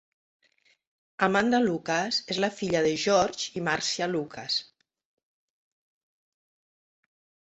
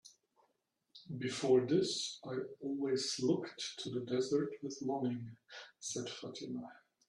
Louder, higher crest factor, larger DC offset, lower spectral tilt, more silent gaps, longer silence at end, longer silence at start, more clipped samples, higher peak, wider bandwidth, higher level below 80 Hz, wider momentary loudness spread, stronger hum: first, -26 LUFS vs -37 LUFS; about the same, 24 dB vs 20 dB; neither; about the same, -3.5 dB/octave vs -4.5 dB/octave; neither; first, 2.8 s vs 0.35 s; first, 1.2 s vs 0.05 s; neither; first, -6 dBFS vs -18 dBFS; second, 8.2 kHz vs 11.5 kHz; first, -66 dBFS vs -80 dBFS; second, 7 LU vs 14 LU; neither